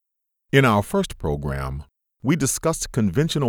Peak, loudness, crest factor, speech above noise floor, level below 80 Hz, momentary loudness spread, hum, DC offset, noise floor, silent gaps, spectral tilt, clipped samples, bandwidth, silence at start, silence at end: -4 dBFS; -22 LUFS; 18 dB; 55 dB; -38 dBFS; 12 LU; none; under 0.1%; -76 dBFS; none; -5 dB/octave; under 0.1%; 19 kHz; 0.55 s; 0 s